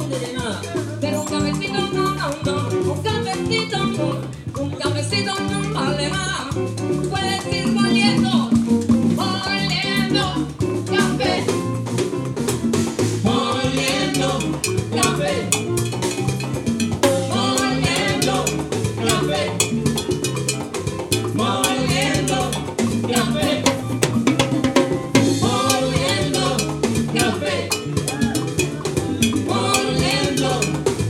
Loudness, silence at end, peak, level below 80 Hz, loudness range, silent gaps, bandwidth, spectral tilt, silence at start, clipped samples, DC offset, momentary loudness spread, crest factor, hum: -20 LUFS; 0 s; 0 dBFS; -42 dBFS; 3 LU; none; 17.5 kHz; -4.5 dB/octave; 0 s; under 0.1%; under 0.1%; 5 LU; 20 dB; none